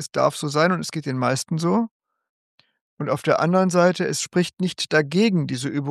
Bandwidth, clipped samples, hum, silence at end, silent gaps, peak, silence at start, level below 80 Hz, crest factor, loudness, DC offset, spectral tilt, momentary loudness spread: 12.5 kHz; under 0.1%; none; 0 s; 1.91-2.00 s, 2.29-2.58 s, 2.81-2.97 s; -4 dBFS; 0 s; -70 dBFS; 18 dB; -22 LUFS; under 0.1%; -5 dB/octave; 7 LU